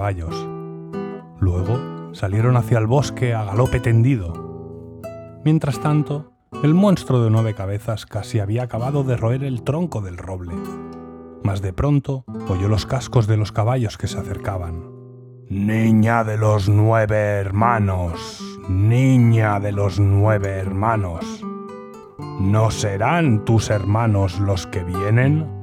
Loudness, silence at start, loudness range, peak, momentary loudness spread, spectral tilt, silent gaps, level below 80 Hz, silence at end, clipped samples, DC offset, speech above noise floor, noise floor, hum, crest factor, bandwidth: -20 LUFS; 0 s; 5 LU; -2 dBFS; 16 LU; -7.5 dB/octave; none; -44 dBFS; 0 s; under 0.1%; under 0.1%; 22 dB; -40 dBFS; none; 18 dB; 12.5 kHz